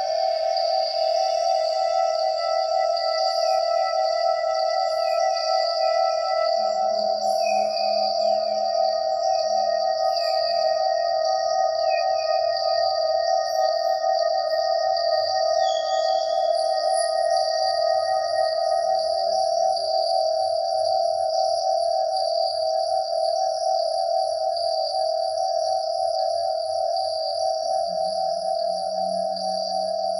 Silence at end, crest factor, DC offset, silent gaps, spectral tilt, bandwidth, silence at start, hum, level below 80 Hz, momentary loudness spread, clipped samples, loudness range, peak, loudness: 0 s; 12 dB; under 0.1%; none; -1 dB/octave; 10.5 kHz; 0 s; none; -68 dBFS; 3 LU; under 0.1%; 2 LU; -10 dBFS; -23 LUFS